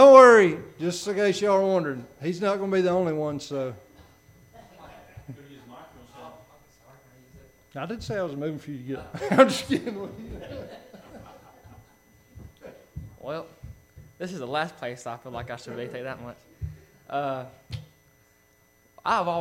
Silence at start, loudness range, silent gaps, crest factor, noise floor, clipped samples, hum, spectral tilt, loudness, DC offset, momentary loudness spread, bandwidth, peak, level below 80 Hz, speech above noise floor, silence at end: 0 s; 17 LU; none; 24 dB; -62 dBFS; under 0.1%; none; -5.5 dB/octave; -24 LUFS; under 0.1%; 25 LU; 14 kHz; -2 dBFS; -56 dBFS; 35 dB; 0 s